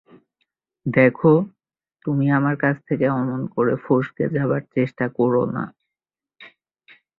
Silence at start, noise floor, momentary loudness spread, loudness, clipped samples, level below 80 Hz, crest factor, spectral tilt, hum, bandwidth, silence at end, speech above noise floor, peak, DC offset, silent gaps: 0.85 s; -89 dBFS; 9 LU; -21 LUFS; under 0.1%; -60 dBFS; 20 dB; -11 dB/octave; none; 4.6 kHz; 0.7 s; 69 dB; -2 dBFS; under 0.1%; none